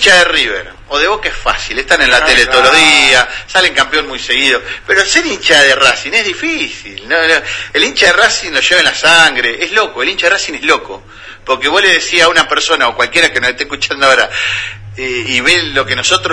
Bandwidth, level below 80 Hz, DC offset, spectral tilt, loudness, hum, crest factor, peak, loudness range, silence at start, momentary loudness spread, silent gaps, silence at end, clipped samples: 11 kHz; -36 dBFS; under 0.1%; -1 dB/octave; -9 LUFS; none; 12 dB; 0 dBFS; 3 LU; 0 s; 10 LU; none; 0 s; 0.7%